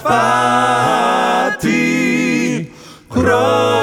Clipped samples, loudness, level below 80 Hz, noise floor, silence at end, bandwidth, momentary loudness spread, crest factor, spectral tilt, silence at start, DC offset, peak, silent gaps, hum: under 0.1%; -14 LUFS; -44 dBFS; -35 dBFS; 0 s; 18 kHz; 6 LU; 14 dB; -4.5 dB/octave; 0 s; 0.3%; 0 dBFS; none; none